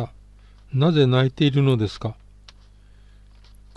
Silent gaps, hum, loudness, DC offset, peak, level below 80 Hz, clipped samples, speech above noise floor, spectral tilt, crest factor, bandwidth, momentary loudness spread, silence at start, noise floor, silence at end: none; 50 Hz at -45 dBFS; -20 LUFS; under 0.1%; -6 dBFS; -48 dBFS; under 0.1%; 30 dB; -8 dB/octave; 16 dB; 8.4 kHz; 15 LU; 0 s; -49 dBFS; 1.65 s